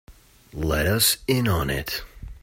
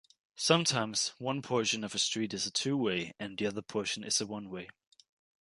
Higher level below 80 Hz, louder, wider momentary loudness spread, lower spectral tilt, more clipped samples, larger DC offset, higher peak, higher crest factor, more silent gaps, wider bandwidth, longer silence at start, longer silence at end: first, -38 dBFS vs -72 dBFS; first, -23 LUFS vs -32 LUFS; first, 15 LU vs 12 LU; about the same, -3.5 dB/octave vs -3 dB/octave; neither; neither; first, -6 dBFS vs -10 dBFS; second, 18 dB vs 24 dB; neither; first, 16.5 kHz vs 11.5 kHz; second, 0.1 s vs 0.35 s; second, 0.05 s vs 0.75 s